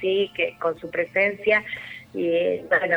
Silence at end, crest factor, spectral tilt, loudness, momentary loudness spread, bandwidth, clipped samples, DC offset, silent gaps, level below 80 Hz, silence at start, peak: 0 s; 16 dB; -6 dB/octave; -23 LUFS; 9 LU; 19.5 kHz; under 0.1%; under 0.1%; none; -62 dBFS; 0 s; -8 dBFS